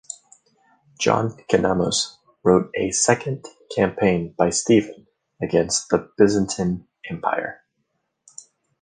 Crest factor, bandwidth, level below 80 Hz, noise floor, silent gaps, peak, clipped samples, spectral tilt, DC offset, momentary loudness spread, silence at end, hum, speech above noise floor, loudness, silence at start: 20 dB; 10 kHz; -52 dBFS; -74 dBFS; none; -2 dBFS; under 0.1%; -4.5 dB/octave; under 0.1%; 13 LU; 1.3 s; none; 53 dB; -21 LUFS; 0.1 s